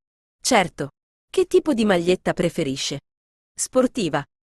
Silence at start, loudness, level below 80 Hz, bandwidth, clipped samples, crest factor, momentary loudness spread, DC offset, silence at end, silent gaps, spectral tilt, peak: 0.45 s; -22 LUFS; -52 dBFS; 12.5 kHz; under 0.1%; 18 dB; 11 LU; under 0.1%; 0.25 s; 1.03-1.28 s, 3.17-3.55 s; -4 dB/octave; -4 dBFS